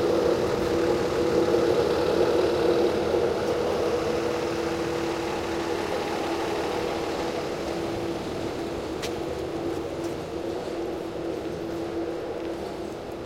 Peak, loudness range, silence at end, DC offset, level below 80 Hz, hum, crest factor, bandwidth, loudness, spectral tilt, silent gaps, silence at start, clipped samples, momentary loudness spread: -10 dBFS; 8 LU; 0 s; under 0.1%; -50 dBFS; none; 16 dB; 16.5 kHz; -27 LUFS; -5.5 dB/octave; none; 0 s; under 0.1%; 9 LU